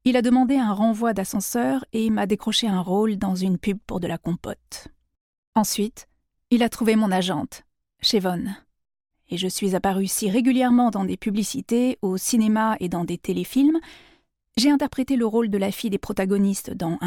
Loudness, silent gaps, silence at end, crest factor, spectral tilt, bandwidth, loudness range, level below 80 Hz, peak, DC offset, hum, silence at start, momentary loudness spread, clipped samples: -22 LUFS; 5.21-5.53 s; 0 s; 16 dB; -5 dB/octave; 18 kHz; 4 LU; -52 dBFS; -8 dBFS; under 0.1%; none; 0.05 s; 9 LU; under 0.1%